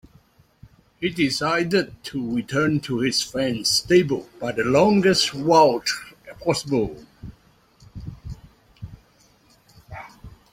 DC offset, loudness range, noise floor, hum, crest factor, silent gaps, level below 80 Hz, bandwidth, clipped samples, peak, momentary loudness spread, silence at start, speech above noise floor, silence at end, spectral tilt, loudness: under 0.1%; 11 LU; -57 dBFS; none; 20 dB; none; -50 dBFS; 16.5 kHz; under 0.1%; -4 dBFS; 25 LU; 1 s; 37 dB; 0.25 s; -4.5 dB/octave; -21 LUFS